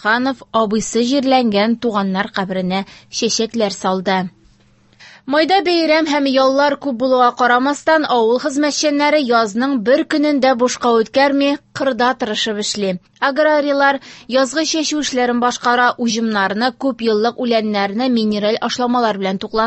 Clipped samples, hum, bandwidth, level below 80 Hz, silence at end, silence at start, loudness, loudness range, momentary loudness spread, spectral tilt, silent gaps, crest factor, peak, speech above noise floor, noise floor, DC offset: under 0.1%; none; 8.6 kHz; -56 dBFS; 0 s; 0 s; -16 LUFS; 3 LU; 6 LU; -4 dB/octave; none; 16 dB; 0 dBFS; 36 dB; -52 dBFS; under 0.1%